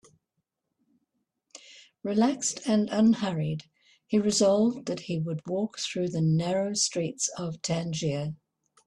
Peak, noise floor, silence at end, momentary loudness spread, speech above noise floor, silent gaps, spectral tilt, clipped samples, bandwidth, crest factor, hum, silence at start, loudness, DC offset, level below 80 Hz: -12 dBFS; -82 dBFS; 0.5 s; 11 LU; 55 dB; none; -5 dB/octave; under 0.1%; 11.5 kHz; 16 dB; none; 1.55 s; -27 LUFS; under 0.1%; -66 dBFS